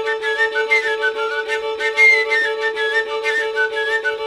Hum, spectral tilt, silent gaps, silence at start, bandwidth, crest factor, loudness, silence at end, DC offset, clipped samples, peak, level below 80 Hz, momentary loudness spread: none; 0 dB/octave; none; 0 s; 13 kHz; 16 dB; -17 LUFS; 0 s; under 0.1%; under 0.1%; -4 dBFS; -62 dBFS; 9 LU